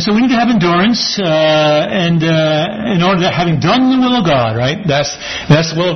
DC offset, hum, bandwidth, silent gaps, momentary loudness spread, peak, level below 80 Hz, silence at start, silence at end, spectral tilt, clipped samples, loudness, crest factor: under 0.1%; none; 6.4 kHz; none; 4 LU; 0 dBFS; -42 dBFS; 0 s; 0 s; -5.5 dB/octave; under 0.1%; -12 LUFS; 12 dB